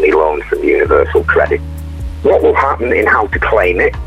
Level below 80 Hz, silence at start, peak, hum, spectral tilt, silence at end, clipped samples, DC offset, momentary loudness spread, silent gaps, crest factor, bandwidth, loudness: -26 dBFS; 0 s; 0 dBFS; none; -7.5 dB/octave; 0 s; under 0.1%; under 0.1%; 7 LU; none; 12 dB; 13 kHz; -12 LUFS